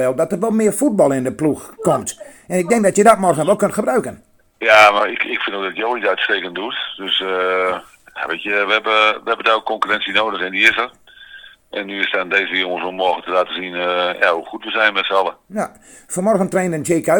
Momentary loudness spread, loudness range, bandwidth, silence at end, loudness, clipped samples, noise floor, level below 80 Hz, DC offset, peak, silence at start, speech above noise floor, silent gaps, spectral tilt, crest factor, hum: 11 LU; 4 LU; 19 kHz; 0 s; -17 LUFS; under 0.1%; -41 dBFS; -58 dBFS; under 0.1%; 0 dBFS; 0 s; 24 dB; none; -3.5 dB/octave; 18 dB; none